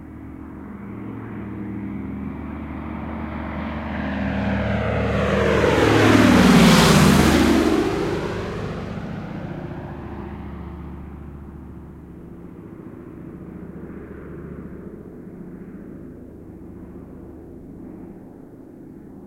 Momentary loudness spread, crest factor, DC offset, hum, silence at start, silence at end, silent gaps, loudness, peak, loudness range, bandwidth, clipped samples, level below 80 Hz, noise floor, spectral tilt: 26 LU; 20 dB; under 0.1%; none; 0 s; 0 s; none; -19 LUFS; -2 dBFS; 23 LU; 16.5 kHz; under 0.1%; -38 dBFS; -41 dBFS; -5.5 dB/octave